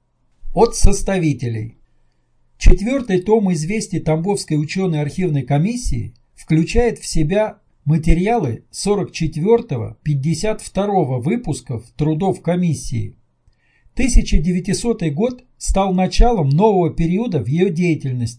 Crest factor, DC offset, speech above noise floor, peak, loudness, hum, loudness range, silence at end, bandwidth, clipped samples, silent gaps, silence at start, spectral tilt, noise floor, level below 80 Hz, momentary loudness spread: 16 dB; under 0.1%; 42 dB; 0 dBFS; -19 LUFS; none; 3 LU; 0.05 s; 10.5 kHz; 0.3%; none; 0.45 s; -6.5 dB/octave; -58 dBFS; -22 dBFS; 9 LU